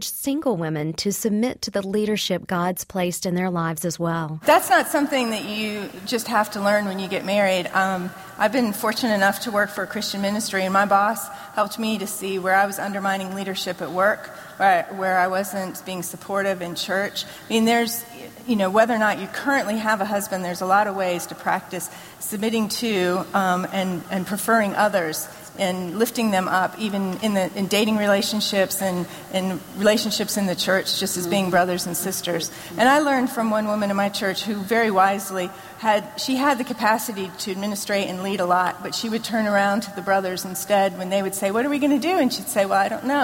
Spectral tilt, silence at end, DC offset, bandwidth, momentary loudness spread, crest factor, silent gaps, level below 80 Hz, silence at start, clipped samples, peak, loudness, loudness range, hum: -4 dB/octave; 0 s; under 0.1%; 16.5 kHz; 8 LU; 18 dB; none; -62 dBFS; 0 s; under 0.1%; -4 dBFS; -22 LUFS; 2 LU; none